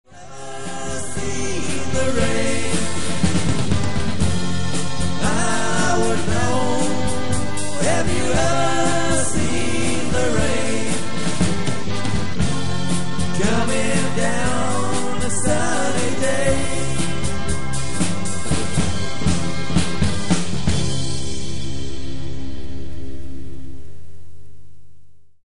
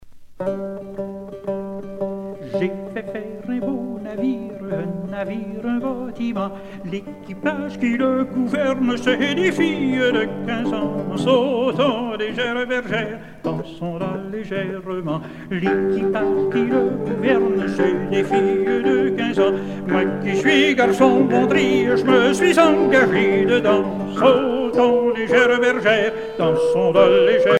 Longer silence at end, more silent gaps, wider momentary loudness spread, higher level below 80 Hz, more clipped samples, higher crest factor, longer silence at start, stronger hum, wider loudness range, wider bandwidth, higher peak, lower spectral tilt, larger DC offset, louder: about the same, 0.05 s vs 0 s; neither; second, 11 LU vs 14 LU; first, -34 dBFS vs -52 dBFS; neither; about the same, 18 dB vs 18 dB; about the same, 0.05 s vs 0.05 s; neither; second, 5 LU vs 10 LU; about the same, 11.5 kHz vs 12.5 kHz; about the same, -2 dBFS vs 0 dBFS; second, -4.5 dB/octave vs -6 dB/octave; first, 10% vs under 0.1%; second, -22 LUFS vs -19 LUFS